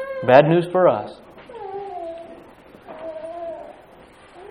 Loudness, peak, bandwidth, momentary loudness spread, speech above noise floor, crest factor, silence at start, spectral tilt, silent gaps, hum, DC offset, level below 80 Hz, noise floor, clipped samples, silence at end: -18 LUFS; 0 dBFS; 10.5 kHz; 26 LU; 31 dB; 22 dB; 0 s; -8 dB/octave; none; none; under 0.1%; -60 dBFS; -47 dBFS; under 0.1%; 0 s